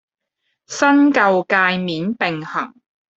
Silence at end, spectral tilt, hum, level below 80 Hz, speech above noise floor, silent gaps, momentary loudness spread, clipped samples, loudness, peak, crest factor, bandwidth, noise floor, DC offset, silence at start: 0.5 s; -5 dB/octave; none; -64 dBFS; 57 dB; none; 13 LU; under 0.1%; -17 LUFS; -2 dBFS; 16 dB; 8 kHz; -73 dBFS; under 0.1%; 0.7 s